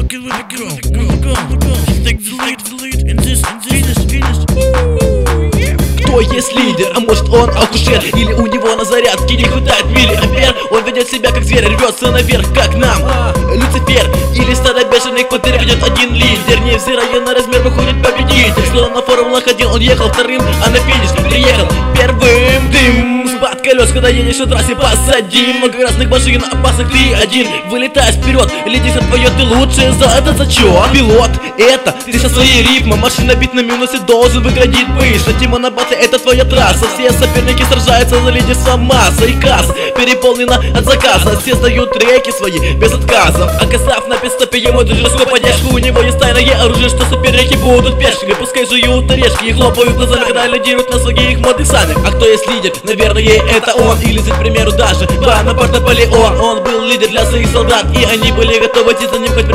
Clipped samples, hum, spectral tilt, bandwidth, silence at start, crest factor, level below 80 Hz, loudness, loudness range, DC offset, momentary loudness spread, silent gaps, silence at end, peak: 0.6%; none; -4.5 dB/octave; 16 kHz; 0 s; 10 dB; -16 dBFS; -9 LUFS; 2 LU; under 0.1%; 5 LU; none; 0 s; 0 dBFS